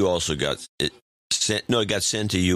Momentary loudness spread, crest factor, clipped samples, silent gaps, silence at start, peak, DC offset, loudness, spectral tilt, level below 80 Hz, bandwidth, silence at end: 6 LU; 16 dB; under 0.1%; 0.69-0.78 s, 1.02-1.30 s; 0 s; -8 dBFS; under 0.1%; -24 LUFS; -3.5 dB/octave; -48 dBFS; 15.5 kHz; 0 s